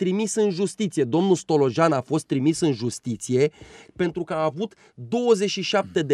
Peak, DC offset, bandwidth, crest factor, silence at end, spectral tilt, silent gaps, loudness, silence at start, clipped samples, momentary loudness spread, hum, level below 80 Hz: -6 dBFS; under 0.1%; 12.5 kHz; 16 dB; 0 s; -5.5 dB/octave; none; -23 LUFS; 0 s; under 0.1%; 8 LU; none; -62 dBFS